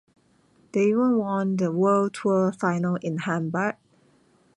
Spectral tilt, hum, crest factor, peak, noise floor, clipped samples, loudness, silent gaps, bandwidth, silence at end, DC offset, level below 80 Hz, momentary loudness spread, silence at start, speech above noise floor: -7.5 dB/octave; none; 16 dB; -10 dBFS; -61 dBFS; under 0.1%; -24 LUFS; none; 11 kHz; 0.85 s; under 0.1%; -70 dBFS; 7 LU; 0.75 s; 38 dB